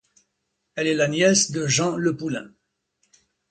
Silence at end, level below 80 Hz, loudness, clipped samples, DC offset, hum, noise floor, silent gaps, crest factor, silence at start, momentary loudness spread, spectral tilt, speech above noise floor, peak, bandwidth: 1.05 s; -62 dBFS; -21 LUFS; under 0.1%; under 0.1%; none; -76 dBFS; none; 20 dB; 0.75 s; 13 LU; -3.5 dB/octave; 55 dB; -4 dBFS; 11 kHz